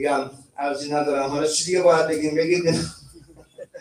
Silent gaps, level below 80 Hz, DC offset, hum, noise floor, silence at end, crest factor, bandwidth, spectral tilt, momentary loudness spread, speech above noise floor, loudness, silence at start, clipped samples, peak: none; -56 dBFS; under 0.1%; none; -48 dBFS; 0 s; 16 dB; 15.5 kHz; -4 dB/octave; 12 LU; 27 dB; -21 LUFS; 0 s; under 0.1%; -6 dBFS